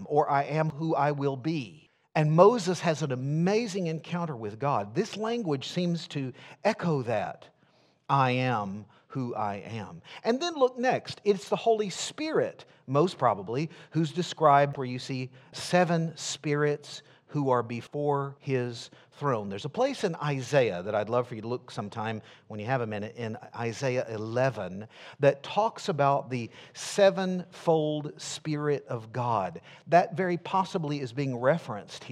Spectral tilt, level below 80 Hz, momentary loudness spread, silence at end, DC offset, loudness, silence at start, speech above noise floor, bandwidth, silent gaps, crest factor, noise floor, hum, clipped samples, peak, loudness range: -6 dB/octave; -76 dBFS; 13 LU; 0 s; under 0.1%; -29 LUFS; 0 s; 36 dB; 12.5 kHz; none; 24 dB; -65 dBFS; none; under 0.1%; -6 dBFS; 4 LU